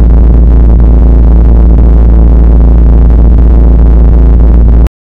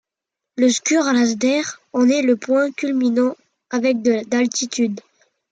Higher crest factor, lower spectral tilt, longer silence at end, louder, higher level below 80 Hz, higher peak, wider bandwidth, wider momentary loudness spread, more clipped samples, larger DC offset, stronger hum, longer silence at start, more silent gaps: second, 2 dB vs 14 dB; first, -11.5 dB/octave vs -3 dB/octave; second, 0.25 s vs 0.5 s; first, -5 LUFS vs -19 LUFS; first, -2 dBFS vs -70 dBFS; first, 0 dBFS vs -6 dBFS; second, 2.1 kHz vs 9.2 kHz; second, 0 LU vs 7 LU; first, 6% vs under 0.1%; first, 5% vs under 0.1%; neither; second, 0 s vs 0.55 s; neither